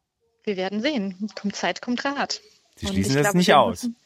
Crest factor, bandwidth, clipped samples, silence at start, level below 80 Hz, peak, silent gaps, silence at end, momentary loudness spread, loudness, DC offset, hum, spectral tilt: 20 dB; 16 kHz; under 0.1%; 0.45 s; -52 dBFS; -2 dBFS; none; 0.1 s; 14 LU; -23 LUFS; under 0.1%; none; -4.5 dB/octave